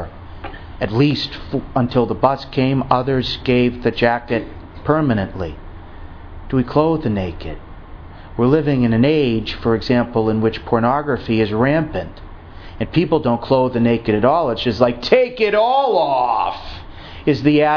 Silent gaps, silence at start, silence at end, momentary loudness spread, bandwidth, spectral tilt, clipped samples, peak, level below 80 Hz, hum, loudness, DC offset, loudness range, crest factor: none; 0 s; 0 s; 18 LU; 5.4 kHz; -8 dB/octave; under 0.1%; 0 dBFS; -36 dBFS; none; -17 LUFS; under 0.1%; 5 LU; 18 dB